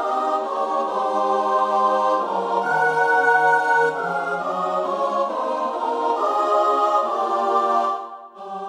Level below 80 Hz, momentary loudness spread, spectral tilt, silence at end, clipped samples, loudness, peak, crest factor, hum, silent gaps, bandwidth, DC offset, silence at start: -72 dBFS; 7 LU; -4 dB/octave; 0 s; under 0.1%; -20 LUFS; -6 dBFS; 16 dB; none; none; 12.5 kHz; under 0.1%; 0 s